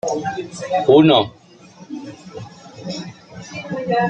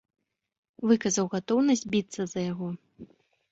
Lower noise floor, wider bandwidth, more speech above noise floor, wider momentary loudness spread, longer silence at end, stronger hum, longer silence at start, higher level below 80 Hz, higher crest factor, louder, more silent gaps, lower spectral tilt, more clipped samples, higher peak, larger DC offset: second, -44 dBFS vs -52 dBFS; first, 9 kHz vs 8 kHz; about the same, 26 dB vs 25 dB; first, 24 LU vs 11 LU; second, 0 s vs 0.45 s; neither; second, 0.05 s vs 0.8 s; first, -58 dBFS vs -66 dBFS; about the same, 18 dB vs 18 dB; first, -17 LUFS vs -27 LUFS; neither; about the same, -5.5 dB/octave vs -5 dB/octave; neither; first, -2 dBFS vs -10 dBFS; neither